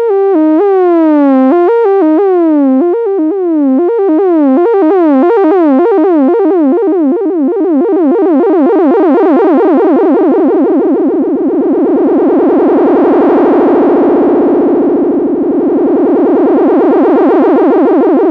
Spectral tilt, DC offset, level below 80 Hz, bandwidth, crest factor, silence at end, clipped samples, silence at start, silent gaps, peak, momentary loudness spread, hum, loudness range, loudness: -9 dB/octave; under 0.1%; -54 dBFS; 4.5 kHz; 6 dB; 0 s; under 0.1%; 0 s; none; -2 dBFS; 3 LU; none; 1 LU; -8 LUFS